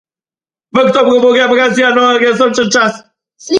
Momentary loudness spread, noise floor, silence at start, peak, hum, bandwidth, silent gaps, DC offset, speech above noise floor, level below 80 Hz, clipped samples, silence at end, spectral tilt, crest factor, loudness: 4 LU; under -90 dBFS; 0.75 s; 0 dBFS; none; 10 kHz; none; under 0.1%; over 81 dB; -56 dBFS; under 0.1%; 0 s; -3.5 dB/octave; 12 dB; -10 LUFS